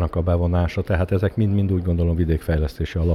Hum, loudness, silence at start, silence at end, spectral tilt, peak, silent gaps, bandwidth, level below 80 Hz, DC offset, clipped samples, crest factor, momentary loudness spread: none; -21 LUFS; 0 s; 0 s; -9 dB/octave; -8 dBFS; none; 12 kHz; -30 dBFS; under 0.1%; under 0.1%; 12 dB; 3 LU